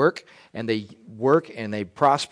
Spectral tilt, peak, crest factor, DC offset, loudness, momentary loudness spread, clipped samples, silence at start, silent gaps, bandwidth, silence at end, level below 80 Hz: -5.5 dB/octave; -6 dBFS; 18 dB; under 0.1%; -24 LUFS; 19 LU; under 0.1%; 0 s; none; 10.5 kHz; 0.05 s; -68 dBFS